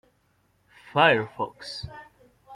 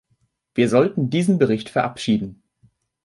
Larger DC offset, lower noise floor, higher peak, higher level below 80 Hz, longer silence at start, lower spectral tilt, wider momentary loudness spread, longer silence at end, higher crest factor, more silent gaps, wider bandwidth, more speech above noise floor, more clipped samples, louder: neither; about the same, -67 dBFS vs -67 dBFS; about the same, -4 dBFS vs -4 dBFS; about the same, -60 dBFS vs -58 dBFS; first, 0.95 s vs 0.55 s; second, -5 dB/octave vs -6.5 dB/octave; first, 20 LU vs 6 LU; second, 0 s vs 0.7 s; first, 24 dB vs 18 dB; neither; first, 13.5 kHz vs 11.5 kHz; second, 43 dB vs 48 dB; neither; second, -24 LUFS vs -20 LUFS